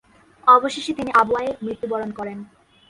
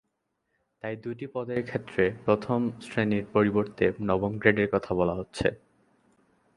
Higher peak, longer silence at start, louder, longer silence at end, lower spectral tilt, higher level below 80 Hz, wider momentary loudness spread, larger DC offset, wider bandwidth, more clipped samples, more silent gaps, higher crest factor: about the same, -2 dBFS vs -4 dBFS; second, 0.45 s vs 0.85 s; first, -20 LUFS vs -28 LUFS; second, 0.45 s vs 1 s; second, -4.5 dB/octave vs -7.5 dB/octave; about the same, -58 dBFS vs -54 dBFS; first, 16 LU vs 11 LU; neither; about the same, 11.5 kHz vs 11.5 kHz; neither; neither; about the same, 20 dB vs 24 dB